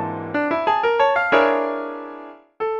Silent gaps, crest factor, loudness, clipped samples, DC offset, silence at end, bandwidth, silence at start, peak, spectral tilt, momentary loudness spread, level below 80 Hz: none; 18 dB; -19 LUFS; under 0.1%; under 0.1%; 0 s; 7.4 kHz; 0 s; -4 dBFS; -6 dB/octave; 16 LU; -62 dBFS